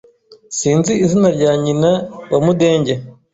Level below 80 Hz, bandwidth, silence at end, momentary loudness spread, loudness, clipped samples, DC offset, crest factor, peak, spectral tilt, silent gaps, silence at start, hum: -50 dBFS; 8 kHz; 0.2 s; 7 LU; -15 LUFS; under 0.1%; under 0.1%; 14 dB; -2 dBFS; -6 dB/octave; none; 0.3 s; none